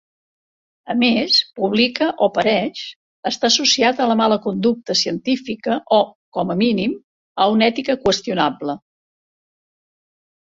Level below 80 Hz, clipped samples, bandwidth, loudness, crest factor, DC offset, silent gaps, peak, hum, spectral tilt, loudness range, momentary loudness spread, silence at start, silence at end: -56 dBFS; under 0.1%; 7.8 kHz; -18 LUFS; 18 dB; under 0.1%; 2.96-3.23 s, 6.15-6.32 s, 7.04-7.35 s; -2 dBFS; none; -3.5 dB/octave; 3 LU; 11 LU; 0.85 s; 1.65 s